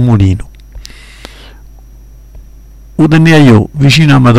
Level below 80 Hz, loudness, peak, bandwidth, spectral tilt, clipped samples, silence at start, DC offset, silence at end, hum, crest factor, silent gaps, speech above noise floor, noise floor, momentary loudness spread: -30 dBFS; -7 LUFS; 0 dBFS; 13.5 kHz; -6.5 dB/octave; 0.6%; 0 s; under 0.1%; 0 s; none; 10 dB; none; 28 dB; -33 dBFS; 10 LU